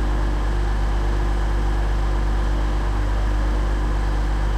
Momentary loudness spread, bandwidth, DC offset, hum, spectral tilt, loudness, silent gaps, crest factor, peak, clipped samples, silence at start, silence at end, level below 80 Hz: 1 LU; 9 kHz; under 0.1%; 50 Hz at -20 dBFS; -6.5 dB/octave; -24 LUFS; none; 8 dB; -12 dBFS; under 0.1%; 0 s; 0 s; -20 dBFS